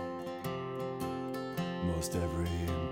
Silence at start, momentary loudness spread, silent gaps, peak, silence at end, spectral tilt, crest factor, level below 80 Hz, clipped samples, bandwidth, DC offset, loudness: 0 s; 5 LU; none; -22 dBFS; 0 s; -6 dB/octave; 14 dB; -48 dBFS; under 0.1%; 16.5 kHz; under 0.1%; -36 LUFS